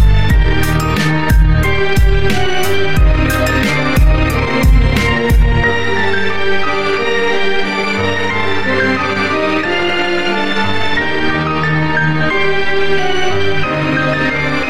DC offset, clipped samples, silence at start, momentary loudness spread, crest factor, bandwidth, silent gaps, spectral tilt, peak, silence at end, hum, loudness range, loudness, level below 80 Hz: under 0.1%; under 0.1%; 0 s; 3 LU; 12 dB; 16 kHz; none; -5.5 dB/octave; 0 dBFS; 0 s; none; 2 LU; -14 LUFS; -18 dBFS